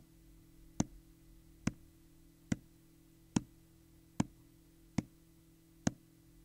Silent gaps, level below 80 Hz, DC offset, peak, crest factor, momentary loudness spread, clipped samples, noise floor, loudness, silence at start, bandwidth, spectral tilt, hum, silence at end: none; -62 dBFS; under 0.1%; -16 dBFS; 28 dB; 24 LU; under 0.1%; -64 dBFS; -42 LUFS; 0.8 s; 16 kHz; -5.5 dB/octave; none; 0.5 s